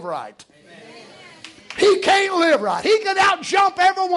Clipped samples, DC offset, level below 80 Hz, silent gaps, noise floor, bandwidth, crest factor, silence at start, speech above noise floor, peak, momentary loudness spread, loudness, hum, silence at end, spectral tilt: under 0.1%; under 0.1%; -62 dBFS; none; -43 dBFS; 11.5 kHz; 14 dB; 0 s; 25 dB; -4 dBFS; 15 LU; -17 LUFS; none; 0 s; -2.5 dB/octave